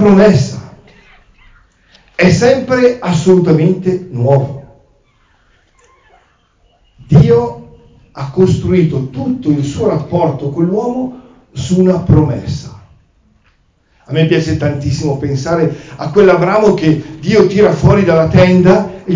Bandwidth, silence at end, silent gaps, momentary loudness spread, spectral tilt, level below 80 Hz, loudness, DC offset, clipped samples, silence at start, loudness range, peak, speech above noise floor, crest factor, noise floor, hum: 7.6 kHz; 0 s; none; 13 LU; -7.5 dB/octave; -34 dBFS; -11 LUFS; under 0.1%; under 0.1%; 0 s; 6 LU; 0 dBFS; 44 dB; 12 dB; -54 dBFS; none